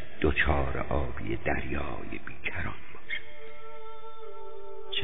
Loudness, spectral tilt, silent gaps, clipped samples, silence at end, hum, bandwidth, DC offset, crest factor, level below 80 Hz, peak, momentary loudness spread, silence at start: -32 LUFS; -4 dB/octave; none; under 0.1%; 0 s; none; 4 kHz; 4%; 20 dB; -40 dBFS; -12 dBFS; 19 LU; 0 s